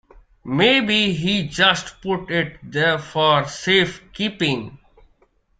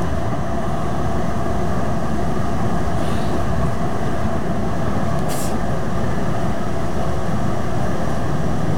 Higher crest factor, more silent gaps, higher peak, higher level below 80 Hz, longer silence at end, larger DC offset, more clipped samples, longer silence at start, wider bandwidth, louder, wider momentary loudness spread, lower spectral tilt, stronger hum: first, 20 dB vs 14 dB; neither; first, -2 dBFS vs -6 dBFS; second, -50 dBFS vs -32 dBFS; first, 0.85 s vs 0 s; second, under 0.1% vs 10%; neither; first, 0.45 s vs 0 s; second, 9.4 kHz vs 17.5 kHz; first, -19 LUFS vs -23 LUFS; first, 10 LU vs 1 LU; second, -4.5 dB/octave vs -6.5 dB/octave; neither